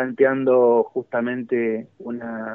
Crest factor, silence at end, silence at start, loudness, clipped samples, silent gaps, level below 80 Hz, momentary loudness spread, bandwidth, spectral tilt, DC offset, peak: 16 dB; 0 s; 0 s; -21 LUFS; under 0.1%; none; -76 dBFS; 14 LU; 3.7 kHz; -6 dB/octave; under 0.1%; -6 dBFS